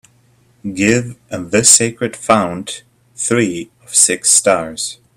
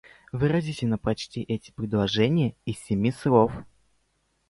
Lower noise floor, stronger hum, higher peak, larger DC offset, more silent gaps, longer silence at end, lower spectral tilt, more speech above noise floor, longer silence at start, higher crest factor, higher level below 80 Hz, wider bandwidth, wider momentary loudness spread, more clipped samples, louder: second, -53 dBFS vs -71 dBFS; neither; first, 0 dBFS vs -6 dBFS; neither; neither; second, 0.2 s vs 0.85 s; second, -2.5 dB/octave vs -7 dB/octave; second, 38 dB vs 46 dB; first, 0.65 s vs 0.35 s; about the same, 16 dB vs 20 dB; about the same, -52 dBFS vs -50 dBFS; first, over 20 kHz vs 11.5 kHz; first, 19 LU vs 10 LU; neither; first, -13 LUFS vs -26 LUFS